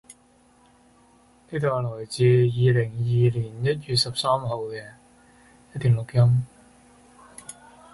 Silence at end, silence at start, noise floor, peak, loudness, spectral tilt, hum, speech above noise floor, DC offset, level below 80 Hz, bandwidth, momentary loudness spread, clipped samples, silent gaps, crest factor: 0.4 s; 0.1 s; -58 dBFS; -8 dBFS; -23 LUFS; -6.5 dB/octave; none; 36 dB; under 0.1%; -54 dBFS; 11.5 kHz; 20 LU; under 0.1%; none; 16 dB